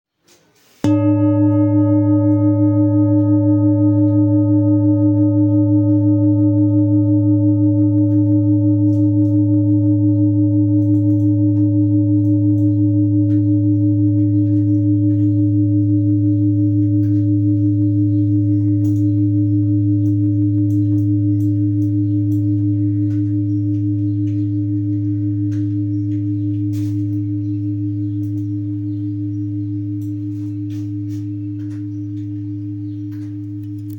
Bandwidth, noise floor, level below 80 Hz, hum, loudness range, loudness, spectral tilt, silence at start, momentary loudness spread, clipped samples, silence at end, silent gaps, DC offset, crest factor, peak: 2.8 kHz; -55 dBFS; -58 dBFS; none; 9 LU; -16 LUFS; -12 dB/octave; 0.85 s; 10 LU; under 0.1%; 0 s; none; under 0.1%; 10 dB; -4 dBFS